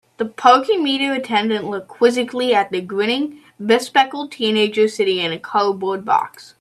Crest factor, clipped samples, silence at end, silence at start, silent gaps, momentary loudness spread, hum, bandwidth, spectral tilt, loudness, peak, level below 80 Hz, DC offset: 18 dB; under 0.1%; 0.15 s; 0.2 s; none; 8 LU; none; 13.5 kHz; -4 dB/octave; -18 LUFS; 0 dBFS; -70 dBFS; under 0.1%